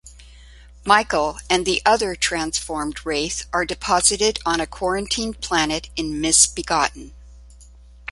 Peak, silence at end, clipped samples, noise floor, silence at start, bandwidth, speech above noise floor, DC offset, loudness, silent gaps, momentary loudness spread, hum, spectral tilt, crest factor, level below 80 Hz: 0 dBFS; 0 s; under 0.1%; -45 dBFS; 0.05 s; 11.5 kHz; 24 dB; under 0.1%; -20 LUFS; none; 9 LU; none; -1.5 dB/octave; 22 dB; -42 dBFS